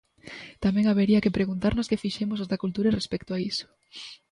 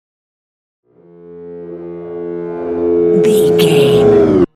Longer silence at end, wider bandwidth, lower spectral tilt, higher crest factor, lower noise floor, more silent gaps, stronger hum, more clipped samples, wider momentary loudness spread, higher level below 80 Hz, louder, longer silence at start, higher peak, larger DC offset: about the same, 0.15 s vs 0.1 s; second, 10.5 kHz vs 14 kHz; about the same, -6.5 dB/octave vs -6.5 dB/octave; about the same, 16 dB vs 14 dB; first, -45 dBFS vs -39 dBFS; neither; neither; neither; about the same, 20 LU vs 19 LU; about the same, -48 dBFS vs -44 dBFS; second, -26 LUFS vs -11 LUFS; second, 0.25 s vs 1.25 s; second, -10 dBFS vs 0 dBFS; neither